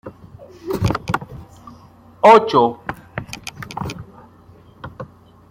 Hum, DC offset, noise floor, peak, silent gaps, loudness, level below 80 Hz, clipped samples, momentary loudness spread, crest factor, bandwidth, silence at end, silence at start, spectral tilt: none; under 0.1%; -46 dBFS; -2 dBFS; none; -17 LUFS; -46 dBFS; under 0.1%; 27 LU; 20 dB; 16.5 kHz; 0.45 s; 0.05 s; -6 dB/octave